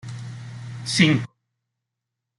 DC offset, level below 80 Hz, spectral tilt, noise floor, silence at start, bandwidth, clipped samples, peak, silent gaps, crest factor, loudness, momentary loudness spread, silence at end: under 0.1%; -62 dBFS; -4.5 dB/octave; -83 dBFS; 0.05 s; 11.5 kHz; under 0.1%; -4 dBFS; none; 22 dB; -20 LUFS; 19 LU; 1.1 s